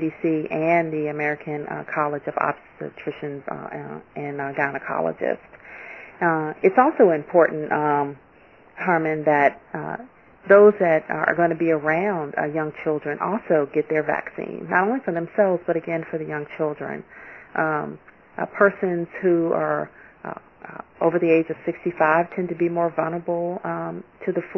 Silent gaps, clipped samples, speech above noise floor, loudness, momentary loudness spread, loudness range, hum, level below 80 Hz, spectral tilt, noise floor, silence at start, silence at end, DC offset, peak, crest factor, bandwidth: none; under 0.1%; 30 dB; -22 LUFS; 16 LU; 8 LU; none; -64 dBFS; -9.5 dB/octave; -52 dBFS; 0 s; 0 s; under 0.1%; 0 dBFS; 22 dB; 6 kHz